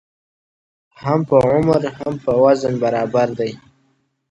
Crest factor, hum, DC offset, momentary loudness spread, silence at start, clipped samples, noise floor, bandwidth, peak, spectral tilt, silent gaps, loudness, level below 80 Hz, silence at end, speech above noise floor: 18 dB; none; under 0.1%; 10 LU; 1 s; under 0.1%; -64 dBFS; 10.5 kHz; 0 dBFS; -7.5 dB/octave; none; -17 LUFS; -50 dBFS; 0.75 s; 47 dB